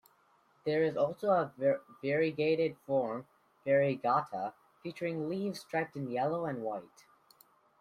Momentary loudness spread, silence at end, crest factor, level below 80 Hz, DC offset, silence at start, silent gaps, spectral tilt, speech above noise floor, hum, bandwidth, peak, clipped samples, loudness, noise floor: 11 LU; 0.95 s; 18 dB; -76 dBFS; under 0.1%; 0.65 s; none; -7 dB/octave; 36 dB; none; 15 kHz; -16 dBFS; under 0.1%; -33 LUFS; -69 dBFS